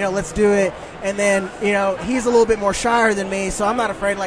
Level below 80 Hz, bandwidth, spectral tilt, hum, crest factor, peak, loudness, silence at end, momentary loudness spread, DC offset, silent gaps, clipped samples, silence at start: -40 dBFS; 11 kHz; -4 dB/octave; none; 16 dB; -4 dBFS; -18 LUFS; 0 s; 6 LU; under 0.1%; none; under 0.1%; 0 s